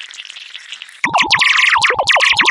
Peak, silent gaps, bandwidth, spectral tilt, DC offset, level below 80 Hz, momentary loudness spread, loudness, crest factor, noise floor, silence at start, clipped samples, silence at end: 0 dBFS; none; 11.5 kHz; -0.5 dB/octave; under 0.1%; -52 dBFS; 20 LU; -11 LUFS; 14 dB; -33 dBFS; 0 s; under 0.1%; 0 s